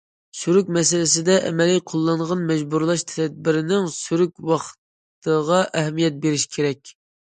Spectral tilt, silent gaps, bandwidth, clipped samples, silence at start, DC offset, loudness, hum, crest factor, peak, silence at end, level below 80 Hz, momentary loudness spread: -4.5 dB/octave; 4.78-5.22 s; 9.6 kHz; under 0.1%; 0.35 s; under 0.1%; -20 LUFS; none; 18 dB; -4 dBFS; 0.45 s; -64 dBFS; 7 LU